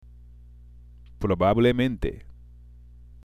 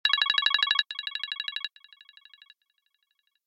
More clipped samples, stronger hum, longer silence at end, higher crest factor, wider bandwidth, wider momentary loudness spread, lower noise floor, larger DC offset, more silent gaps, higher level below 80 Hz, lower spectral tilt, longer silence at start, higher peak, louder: neither; first, 60 Hz at -45 dBFS vs none; second, 0.95 s vs 1.8 s; second, 18 dB vs 24 dB; first, 13.5 kHz vs 12 kHz; about the same, 13 LU vs 12 LU; second, -48 dBFS vs -75 dBFS; neither; neither; first, -40 dBFS vs under -90 dBFS; first, -8 dB/octave vs 4 dB/octave; first, 1.2 s vs 0.05 s; about the same, -8 dBFS vs -8 dBFS; about the same, -24 LUFS vs -25 LUFS